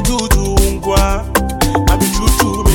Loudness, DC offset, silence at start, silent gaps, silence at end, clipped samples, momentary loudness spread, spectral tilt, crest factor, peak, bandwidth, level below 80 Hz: -14 LUFS; under 0.1%; 0 s; none; 0 s; under 0.1%; 2 LU; -4.5 dB/octave; 12 dB; 0 dBFS; 18.5 kHz; -16 dBFS